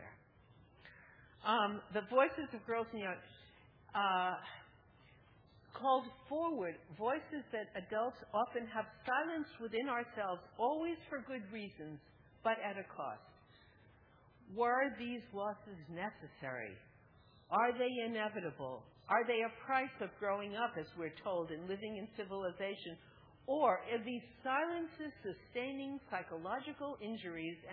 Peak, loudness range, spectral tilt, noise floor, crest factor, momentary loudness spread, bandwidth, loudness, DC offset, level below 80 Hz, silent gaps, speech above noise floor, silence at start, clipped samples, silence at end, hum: -18 dBFS; 4 LU; -2.5 dB/octave; -66 dBFS; 22 dB; 14 LU; 4.8 kHz; -40 LUFS; under 0.1%; -74 dBFS; none; 26 dB; 0 s; under 0.1%; 0 s; none